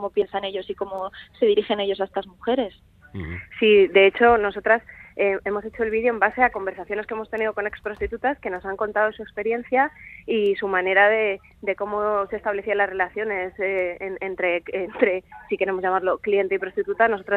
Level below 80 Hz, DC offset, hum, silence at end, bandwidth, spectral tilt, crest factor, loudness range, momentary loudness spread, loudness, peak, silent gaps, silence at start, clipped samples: -52 dBFS; under 0.1%; none; 0 s; 4.5 kHz; -7 dB/octave; 20 dB; 5 LU; 13 LU; -23 LUFS; -2 dBFS; none; 0 s; under 0.1%